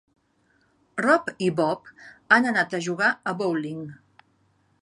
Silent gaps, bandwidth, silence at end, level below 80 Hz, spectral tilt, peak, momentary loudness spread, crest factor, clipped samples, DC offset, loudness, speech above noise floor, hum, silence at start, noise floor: none; 11 kHz; 0.85 s; -72 dBFS; -5 dB/octave; -2 dBFS; 15 LU; 24 dB; under 0.1%; under 0.1%; -23 LUFS; 42 dB; none; 0.95 s; -66 dBFS